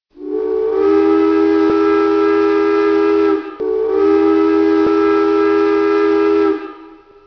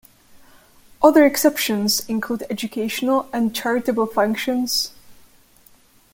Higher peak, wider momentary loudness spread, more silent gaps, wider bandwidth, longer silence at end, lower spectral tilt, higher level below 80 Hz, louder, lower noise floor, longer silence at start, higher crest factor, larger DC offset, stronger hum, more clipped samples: about the same, -4 dBFS vs -2 dBFS; second, 6 LU vs 11 LU; neither; second, 5.4 kHz vs 17 kHz; second, 0.4 s vs 1 s; first, -6.5 dB/octave vs -3.5 dB/octave; first, -50 dBFS vs -58 dBFS; first, -14 LUFS vs -19 LUFS; second, -40 dBFS vs -53 dBFS; second, 0.15 s vs 1 s; second, 10 dB vs 20 dB; neither; neither; neither